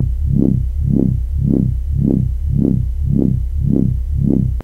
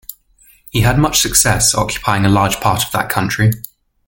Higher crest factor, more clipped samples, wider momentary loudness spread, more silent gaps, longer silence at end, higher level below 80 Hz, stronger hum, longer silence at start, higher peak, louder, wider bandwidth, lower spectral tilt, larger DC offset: about the same, 14 dB vs 16 dB; neither; second, 3 LU vs 9 LU; neither; second, 0 s vs 0.45 s; first, -20 dBFS vs -32 dBFS; neither; about the same, 0 s vs 0.1 s; about the same, 0 dBFS vs 0 dBFS; second, -17 LUFS vs -14 LUFS; second, 2 kHz vs 17 kHz; first, -12 dB/octave vs -3.5 dB/octave; neither